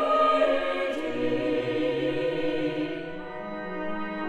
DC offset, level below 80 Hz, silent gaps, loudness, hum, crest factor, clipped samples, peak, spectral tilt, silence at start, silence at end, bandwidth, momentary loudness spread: under 0.1%; -56 dBFS; none; -27 LUFS; none; 16 dB; under 0.1%; -12 dBFS; -6.5 dB/octave; 0 s; 0 s; 10.5 kHz; 13 LU